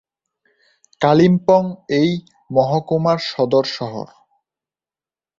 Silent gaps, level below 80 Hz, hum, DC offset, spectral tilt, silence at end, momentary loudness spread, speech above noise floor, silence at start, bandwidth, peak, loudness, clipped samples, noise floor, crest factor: none; -58 dBFS; none; under 0.1%; -7 dB/octave; 1.35 s; 14 LU; over 74 dB; 1 s; 7.6 kHz; 0 dBFS; -17 LUFS; under 0.1%; under -90 dBFS; 18 dB